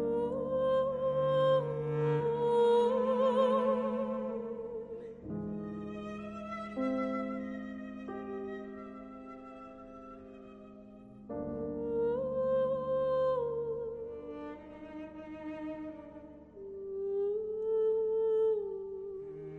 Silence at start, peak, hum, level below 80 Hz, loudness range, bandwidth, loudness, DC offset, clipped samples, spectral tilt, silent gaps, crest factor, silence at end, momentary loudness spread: 0 s; -18 dBFS; none; -64 dBFS; 14 LU; 9.6 kHz; -33 LUFS; under 0.1%; under 0.1%; -8 dB/octave; none; 16 dB; 0 s; 20 LU